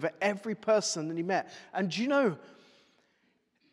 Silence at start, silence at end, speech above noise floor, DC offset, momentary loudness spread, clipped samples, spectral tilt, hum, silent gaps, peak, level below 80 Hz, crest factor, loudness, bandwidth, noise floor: 0 s; 1.2 s; 42 dB; under 0.1%; 7 LU; under 0.1%; -4 dB/octave; none; none; -14 dBFS; -90 dBFS; 18 dB; -30 LUFS; 12.5 kHz; -73 dBFS